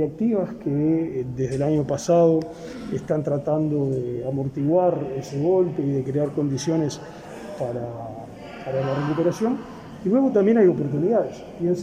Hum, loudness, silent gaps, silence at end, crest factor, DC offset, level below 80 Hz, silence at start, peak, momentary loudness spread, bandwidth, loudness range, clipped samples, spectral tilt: none; -23 LUFS; none; 0 s; 16 dB; under 0.1%; -54 dBFS; 0 s; -6 dBFS; 16 LU; 12.5 kHz; 5 LU; under 0.1%; -7.5 dB/octave